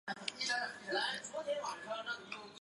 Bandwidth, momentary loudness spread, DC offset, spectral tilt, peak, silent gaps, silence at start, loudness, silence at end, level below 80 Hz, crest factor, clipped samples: 11.5 kHz; 6 LU; under 0.1%; -1 dB/octave; -16 dBFS; none; 0.05 s; -39 LUFS; 0.05 s; -84 dBFS; 26 dB; under 0.1%